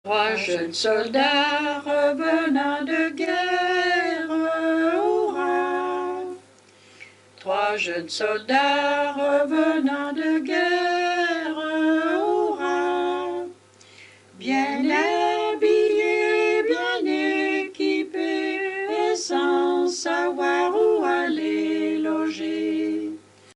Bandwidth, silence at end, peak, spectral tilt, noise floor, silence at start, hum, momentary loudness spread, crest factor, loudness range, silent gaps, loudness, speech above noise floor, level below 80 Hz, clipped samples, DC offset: 11 kHz; 0.4 s; -8 dBFS; -3 dB/octave; -52 dBFS; 0.05 s; none; 6 LU; 16 dB; 3 LU; none; -22 LUFS; 30 dB; -76 dBFS; under 0.1%; under 0.1%